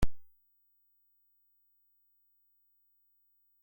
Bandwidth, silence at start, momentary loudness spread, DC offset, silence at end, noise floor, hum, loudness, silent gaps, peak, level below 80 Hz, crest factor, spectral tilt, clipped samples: 16.5 kHz; 0 s; 0 LU; under 0.1%; 0 s; -72 dBFS; 50 Hz at -120 dBFS; -42 LUFS; none; -16 dBFS; -48 dBFS; 22 dB; -6.5 dB/octave; under 0.1%